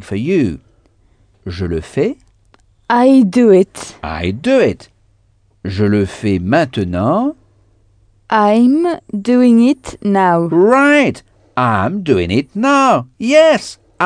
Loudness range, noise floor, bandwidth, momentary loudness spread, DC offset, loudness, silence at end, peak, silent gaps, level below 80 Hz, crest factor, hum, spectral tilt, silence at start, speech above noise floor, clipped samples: 5 LU; -54 dBFS; 10 kHz; 14 LU; under 0.1%; -13 LUFS; 0 s; 0 dBFS; none; -42 dBFS; 14 dB; none; -6.5 dB/octave; 0 s; 42 dB; under 0.1%